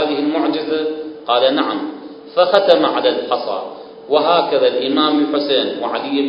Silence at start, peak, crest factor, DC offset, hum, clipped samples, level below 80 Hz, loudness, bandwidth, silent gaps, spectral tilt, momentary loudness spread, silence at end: 0 s; 0 dBFS; 16 dB; under 0.1%; none; under 0.1%; -66 dBFS; -16 LUFS; 5.4 kHz; none; -6 dB/octave; 11 LU; 0 s